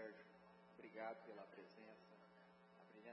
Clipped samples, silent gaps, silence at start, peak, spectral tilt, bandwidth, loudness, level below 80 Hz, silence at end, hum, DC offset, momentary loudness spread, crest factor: under 0.1%; none; 0 s; -40 dBFS; -4 dB/octave; 5.6 kHz; -60 LUFS; under -90 dBFS; 0 s; none; under 0.1%; 15 LU; 20 dB